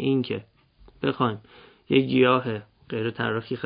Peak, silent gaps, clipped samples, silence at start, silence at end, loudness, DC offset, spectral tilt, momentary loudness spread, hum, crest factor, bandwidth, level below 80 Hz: -8 dBFS; none; under 0.1%; 0 s; 0 s; -25 LUFS; under 0.1%; -11 dB/octave; 14 LU; none; 18 dB; 5.2 kHz; -60 dBFS